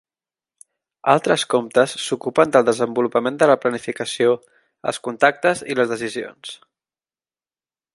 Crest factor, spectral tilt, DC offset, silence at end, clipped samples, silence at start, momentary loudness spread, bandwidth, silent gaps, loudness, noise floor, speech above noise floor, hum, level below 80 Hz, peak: 20 dB; -4 dB/octave; under 0.1%; 1.4 s; under 0.1%; 1.05 s; 11 LU; 11.5 kHz; none; -19 LUFS; under -90 dBFS; over 71 dB; none; -68 dBFS; 0 dBFS